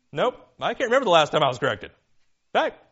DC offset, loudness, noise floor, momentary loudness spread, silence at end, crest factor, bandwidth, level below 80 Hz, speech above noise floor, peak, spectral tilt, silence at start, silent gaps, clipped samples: under 0.1%; -23 LUFS; -63 dBFS; 11 LU; 0.2 s; 20 dB; 8 kHz; -62 dBFS; 40 dB; -4 dBFS; -2 dB/octave; 0.15 s; none; under 0.1%